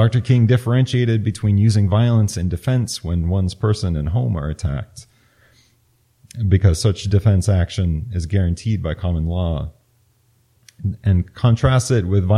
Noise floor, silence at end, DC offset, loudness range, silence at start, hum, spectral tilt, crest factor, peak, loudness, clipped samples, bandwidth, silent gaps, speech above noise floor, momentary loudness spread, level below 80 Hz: -60 dBFS; 0 s; under 0.1%; 5 LU; 0 s; none; -7 dB/octave; 16 dB; -2 dBFS; -19 LUFS; under 0.1%; 12 kHz; none; 43 dB; 9 LU; -34 dBFS